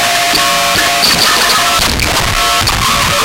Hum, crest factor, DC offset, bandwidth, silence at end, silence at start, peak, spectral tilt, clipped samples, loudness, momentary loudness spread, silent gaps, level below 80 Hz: none; 10 dB; under 0.1%; 17.5 kHz; 0 s; 0 s; 0 dBFS; -1.5 dB/octave; under 0.1%; -9 LUFS; 3 LU; none; -26 dBFS